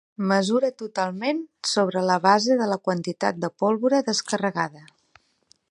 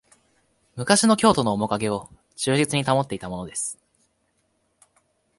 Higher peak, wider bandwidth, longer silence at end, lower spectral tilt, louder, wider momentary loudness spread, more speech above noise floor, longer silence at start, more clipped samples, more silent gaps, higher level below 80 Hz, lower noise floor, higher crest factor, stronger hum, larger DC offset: about the same, -4 dBFS vs -2 dBFS; about the same, 11 kHz vs 11.5 kHz; second, 0.9 s vs 1.65 s; about the same, -4.5 dB/octave vs -4 dB/octave; about the same, -23 LUFS vs -22 LUFS; second, 8 LU vs 15 LU; second, 40 dB vs 48 dB; second, 0.2 s vs 0.75 s; neither; neither; second, -74 dBFS vs -56 dBFS; second, -63 dBFS vs -70 dBFS; about the same, 20 dB vs 22 dB; neither; neither